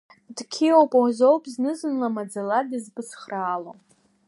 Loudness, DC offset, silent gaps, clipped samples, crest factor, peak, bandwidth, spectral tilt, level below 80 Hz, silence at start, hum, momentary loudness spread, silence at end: -23 LUFS; under 0.1%; none; under 0.1%; 20 dB; -4 dBFS; 11.5 kHz; -5 dB/octave; -82 dBFS; 0.3 s; none; 19 LU; 0.55 s